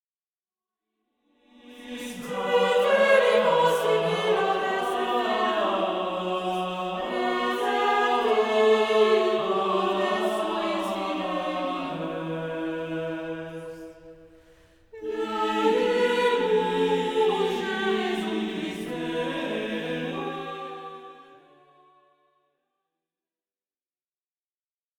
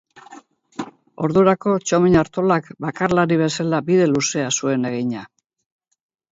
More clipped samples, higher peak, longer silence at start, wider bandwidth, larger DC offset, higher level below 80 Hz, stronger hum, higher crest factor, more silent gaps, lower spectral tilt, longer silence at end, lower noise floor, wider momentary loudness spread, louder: neither; second, -8 dBFS vs -2 dBFS; first, 1.65 s vs 0.15 s; first, 19 kHz vs 8 kHz; neither; second, -64 dBFS vs -50 dBFS; neither; about the same, 18 dB vs 18 dB; neither; about the same, -4.5 dB/octave vs -5 dB/octave; first, 3.75 s vs 1.05 s; first, under -90 dBFS vs -45 dBFS; second, 14 LU vs 17 LU; second, -25 LUFS vs -19 LUFS